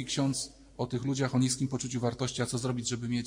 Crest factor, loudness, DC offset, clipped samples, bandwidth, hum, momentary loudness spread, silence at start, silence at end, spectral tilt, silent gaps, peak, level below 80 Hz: 16 dB; -32 LUFS; under 0.1%; under 0.1%; 15.5 kHz; none; 7 LU; 0 s; 0 s; -5 dB/octave; none; -16 dBFS; -58 dBFS